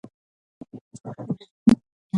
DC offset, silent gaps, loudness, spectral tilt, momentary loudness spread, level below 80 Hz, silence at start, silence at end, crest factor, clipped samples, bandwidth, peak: under 0.1%; 0.81-0.91 s, 1.51-1.66 s, 1.92-2.10 s; -24 LUFS; -7.5 dB/octave; 23 LU; -54 dBFS; 0.75 s; 0 s; 22 dB; under 0.1%; 11 kHz; -4 dBFS